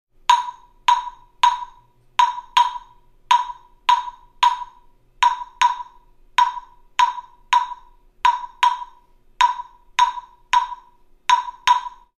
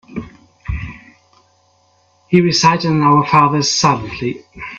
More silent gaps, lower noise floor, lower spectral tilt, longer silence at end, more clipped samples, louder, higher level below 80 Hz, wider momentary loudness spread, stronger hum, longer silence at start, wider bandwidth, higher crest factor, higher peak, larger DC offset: neither; second, -52 dBFS vs -56 dBFS; second, 2 dB/octave vs -4.5 dB/octave; first, 0.3 s vs 0 s; neither; second, -20 LUFS vs -14 LUFS; second, -52 dBFS vs -38 dBFS; about the same, 17 LU vs 19 LU; neither; first, 0.3 s vs 0.1 s; first, 11.5 kHz vs 7.8 kHz; about the same, 20 dB vs 16 dB; about the same, -2 dBFS vs 0 dBFS; neither